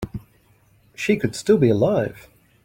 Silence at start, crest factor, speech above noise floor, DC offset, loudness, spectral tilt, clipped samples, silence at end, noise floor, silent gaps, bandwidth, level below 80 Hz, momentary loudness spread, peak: 0 s; 18 dB; 38 dB; under 0.1%; -20 LUFS; -6.5 dB/octave; under 0.1%; 0.45 s; -57 dBFS; none; 16.5 kHz; -50 dBFS; 15 LU; -4 dBFS